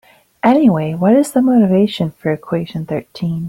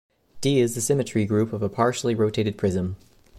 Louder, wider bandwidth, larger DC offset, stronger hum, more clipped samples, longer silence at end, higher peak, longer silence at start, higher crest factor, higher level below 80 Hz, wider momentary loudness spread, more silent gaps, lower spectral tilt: first, -15 LUFS vs -24 LUFS; about the same, 15.5 kHz vs 15.5 kHz; neither; neither; neither; about the same, 0 s vs 0 s; first, -2 dBFS vs -8 dBFS; about the same, 0.45 s vs 0.35 s; about the same, 12 dB vs 16 dB; about the same, -54 dBFS vs -54 dBFS; first, 10 LU vs 6 LU; neither; first, -7 dB/octave vs -5.5 dB/octave